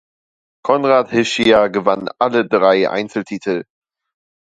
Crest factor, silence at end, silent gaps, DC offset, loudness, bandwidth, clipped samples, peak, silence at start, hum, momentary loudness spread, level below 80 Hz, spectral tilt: 16 dB; 0.9 s; none; under 0.1%; -16 LUFS; 9.6 kHz; under 0.1%; 0 dBFS; 0.65 s; none; 10 LU; -56 dBFS; -5 dB/octave